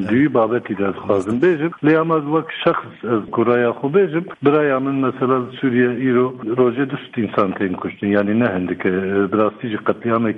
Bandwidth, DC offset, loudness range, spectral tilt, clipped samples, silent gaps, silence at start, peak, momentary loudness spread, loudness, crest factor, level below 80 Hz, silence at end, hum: 8.2 kHz; under 0.1%; 2 LU; -8.5 dB/octave; under 0.1%; none; 0 s; -2 dBFS; 6 LU; -18 LUFS; 16 dB; -60 dBFS; 0 s; none